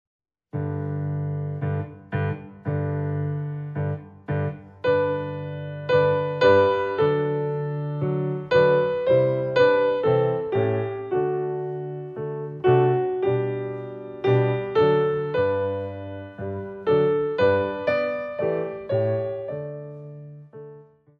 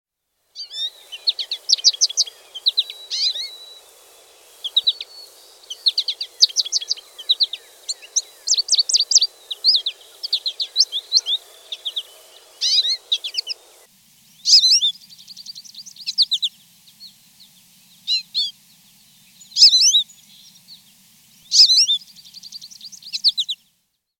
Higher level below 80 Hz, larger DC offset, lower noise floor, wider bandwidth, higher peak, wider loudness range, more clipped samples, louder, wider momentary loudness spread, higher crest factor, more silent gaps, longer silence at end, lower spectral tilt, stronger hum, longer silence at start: first, -60 dBFS vs -80 dBFS; neither; second, -48 dBFS vs -70 dBFS; second, 7 kHz vs 17 kHz; second, -4 dBFS vs 0 dBFS; about the same, 7 LU vs 7 LU; neither; second, -24 LUFS vs -16 LUFS; second, 13 LU vs 22 LU; about the same, 18 dB vs 22 dB; neither; second, 0.35 s vs 0.65 s; first, -9 dB/octave vs 4.5 dB/octave; neither; about the same, 0.55 s vs 0.55 s